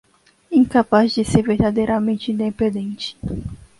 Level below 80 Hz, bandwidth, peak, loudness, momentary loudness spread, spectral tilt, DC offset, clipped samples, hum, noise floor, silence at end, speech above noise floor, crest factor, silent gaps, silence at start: -40 dBFS; 11.5 kHz; -2 dBFS; -19 LUFS; 12 LU; -6.5 dB/octave; under 0.1%; under 0.1%; none; -37 dBFS; 0.25 s; 19 dB; 18 dB; none; 0.5 s